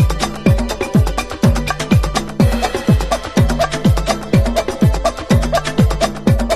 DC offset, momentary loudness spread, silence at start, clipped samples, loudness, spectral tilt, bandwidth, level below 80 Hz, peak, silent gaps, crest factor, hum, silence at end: under 0.1%; 3 LU; 0 s; under 0.1%; -16 LUFS; -6 dB/octave; 14 kHz; -22 dBFS; 0 dBFS; none; 14 dB; none; 0 s